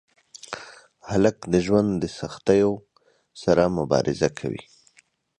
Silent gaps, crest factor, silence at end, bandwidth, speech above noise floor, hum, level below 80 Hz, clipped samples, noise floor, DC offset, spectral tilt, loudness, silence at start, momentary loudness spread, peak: none; 20 dB; 0.8 s; 11 kHz; 39 dB; none; -50 dBFS; under 0.1%; -61 dBFS; under 0.1%; -6.5 dB/octave; -23 LUFS; 0.5 s; 17 LU; -4 dBFS